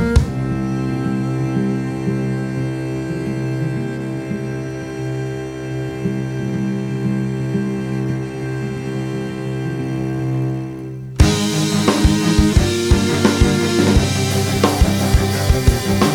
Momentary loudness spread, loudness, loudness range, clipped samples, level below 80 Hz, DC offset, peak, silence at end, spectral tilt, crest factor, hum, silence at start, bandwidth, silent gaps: 10 LU; -19 LUFS; 8 LU; under 0.1%; -26 dBFS; under 0.1%; 0 dBFS; 0 s; -5.5 dB/octave; 18 dB; none; 0 s; 18 kHz; none